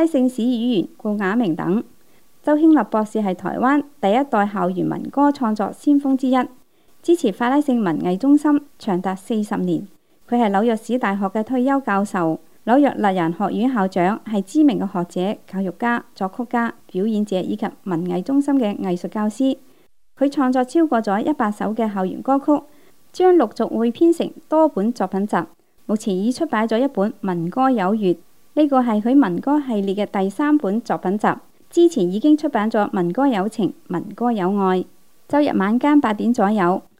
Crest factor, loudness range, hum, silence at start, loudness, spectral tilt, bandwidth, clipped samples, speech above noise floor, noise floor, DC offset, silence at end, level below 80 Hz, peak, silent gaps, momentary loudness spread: 18 dB; 3 LU; none; 0 s; -19 LUFS; -7 dB/octave; 15 kHz; under 0.1%; 38 dB; -57 dBFS; 0.4%; 0.2 s; -68 dBFS; -2 dBFS; none; 8 LU